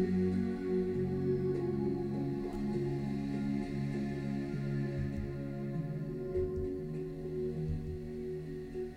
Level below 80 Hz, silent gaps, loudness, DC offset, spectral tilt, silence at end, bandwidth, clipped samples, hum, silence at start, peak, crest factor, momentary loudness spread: -50 dBFS; none; -36 LUFS; under 0.1%; -9.5 dB/octave; 0 s; 10.5 kHz; under 0.1%; none; 0 s; -22 dBFS; 14 dB; 7 LU